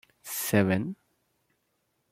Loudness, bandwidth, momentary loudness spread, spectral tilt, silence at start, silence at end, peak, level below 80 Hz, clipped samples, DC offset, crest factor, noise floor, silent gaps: -27 LUFS; 16.5 kHz; 14 LU; -5.5 dB/octave; 0.25 s; 1.2 s; -8 dBFS; -68 dBFS; under 0.1%; under 0.1%; 24 dB; -76 dBFS; none